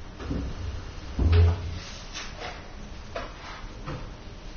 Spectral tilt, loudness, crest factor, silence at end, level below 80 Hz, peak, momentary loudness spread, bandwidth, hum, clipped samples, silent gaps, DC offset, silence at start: -6 dB/octave; -30 LUFS; 18 dB; 0 s; -34 dBFS; -10 dBFS; 19 LU; 6.8 kHz; none; under 0.1%; none; under 0.1%; 0 s